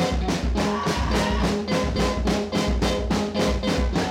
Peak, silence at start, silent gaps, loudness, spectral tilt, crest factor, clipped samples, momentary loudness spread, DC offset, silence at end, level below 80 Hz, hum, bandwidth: -14 dBFS; 0 s; none; -24 LUFS; -5.5 dB/octave; 8 dB; under 0.1%; 2 LU; under 0.1%; 0 s; -28 dBFS; none; 16 kHz